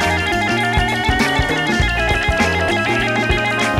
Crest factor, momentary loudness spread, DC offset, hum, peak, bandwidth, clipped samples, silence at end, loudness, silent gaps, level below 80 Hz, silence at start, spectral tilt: 14 dB; 1 LU; 0.2%; none; -2 dBFS; 16.5 kHz; under 0.1%; 0 s; -16 LUFS; none; -26 dBFS; 0 s; -4.5 dB/octave